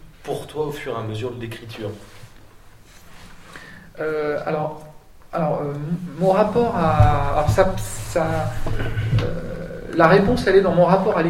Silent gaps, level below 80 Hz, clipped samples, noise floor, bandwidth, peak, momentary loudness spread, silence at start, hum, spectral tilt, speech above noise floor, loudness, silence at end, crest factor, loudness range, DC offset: none; -34 dBFS; under 0.1%; -45 dBFS; 16 kHz; 0 dBFS; 16 LU; 0.05 s; none; -7 dB/octave; 26 dB; -21 LUFS; 0 s; 20 dB; 12 LU; under 0.1%